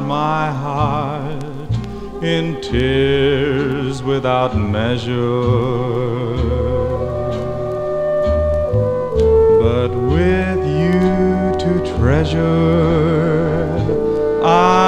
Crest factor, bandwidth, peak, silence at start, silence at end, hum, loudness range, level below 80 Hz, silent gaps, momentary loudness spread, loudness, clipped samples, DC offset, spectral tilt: 16 dB; 9.6 kHz; 0 dBFS; 0 s; 0 s; none; 4 LU; -30 dBFS; none; 7 LU; -17 LUFS; under 0.1%; under 0.1%; -7.5 dB/octave